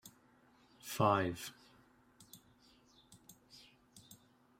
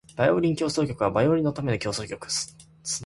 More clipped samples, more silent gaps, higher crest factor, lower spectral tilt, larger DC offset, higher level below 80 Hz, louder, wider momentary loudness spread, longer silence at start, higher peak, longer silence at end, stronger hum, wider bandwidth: neither; neither; first, 26 dB vs 18 dB; about the same, -5 dB/octave vs -5 dB/octave; neither; second, -74 dBFS vs -52 dBFS; second, -36 LUFS vs -25 LUFS; first, 28 LU vs 10 LU; about the same, 0.05 s vs 0.15 s; second, -18 dBFS vs -8 dBFS; first, 0.45 s vs 0 s; neither; first, 16 kHz vs 11.5 kHz